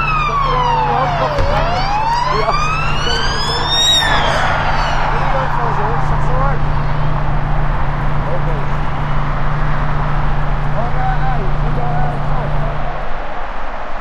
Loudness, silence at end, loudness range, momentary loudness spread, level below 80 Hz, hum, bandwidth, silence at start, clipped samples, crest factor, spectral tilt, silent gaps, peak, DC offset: -17 LUFS; 0 s; 5 LU; 6 LU; -20 dBFS; none; 11 kHz; 0 s; under 0.1%; 14 dB; -4.5 dB/octave; none; 0 dBFS; under 0.1%